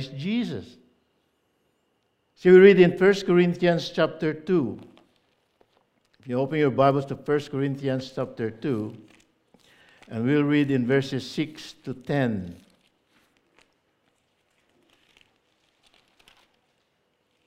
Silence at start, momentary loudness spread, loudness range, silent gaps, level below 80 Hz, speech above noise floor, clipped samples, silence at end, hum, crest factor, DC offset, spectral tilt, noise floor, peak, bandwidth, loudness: 0 s; 16 LU; 13 LU; none; -66 dBFS; 49 dB; under 0.1%; 4.95 s; none; 22 dB; under 0.1%; -7.5 dB/octave; -72 dBFS; -2 dBFS; 9 kHz; -23 LUFS